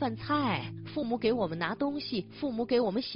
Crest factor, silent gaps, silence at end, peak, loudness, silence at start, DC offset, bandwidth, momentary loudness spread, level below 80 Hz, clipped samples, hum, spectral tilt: 16 dB; none; 0 s; -14 dBFS; -31 LUFS; 0 s; under 0.1%; 5.6 kHz; 7 LU; -62 dBFS; under 0.1%; none; -4.5 dB/octave